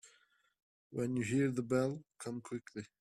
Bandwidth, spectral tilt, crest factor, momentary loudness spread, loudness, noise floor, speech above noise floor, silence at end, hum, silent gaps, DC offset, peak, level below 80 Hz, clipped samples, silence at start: 12.5 kHz; -6.5 dB/octave; 18 dB; 12 LU; -38 LUFS; -72 dBFS; 35 dB; 0.15 s; none; 0.63-0.90 s; under 0.1%; -22 dBFS; -74 dBFS; under 0.1%; 0.05 s